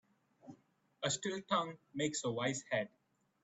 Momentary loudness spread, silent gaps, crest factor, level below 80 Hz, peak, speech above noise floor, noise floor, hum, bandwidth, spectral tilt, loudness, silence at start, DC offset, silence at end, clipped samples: 18 LU; none; 20 dB; -80 dBFS; -20 dBFS; 30 dB; -69 dBFS; none; 8.8 kHz; -3.5 dB/octave; -38 LUFS; 0.45 s; under 0.1%; 0.55 s; under 0.1%